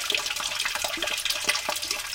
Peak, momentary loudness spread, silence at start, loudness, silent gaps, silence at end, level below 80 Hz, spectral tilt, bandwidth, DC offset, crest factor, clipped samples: -8 dBFS; 3 LU; 0 s; -26 LUFS; none; 0 s; -56 dBFS; 1 dB/octave; 17 kHz; under 0.1%; 22 dB; under 0.1%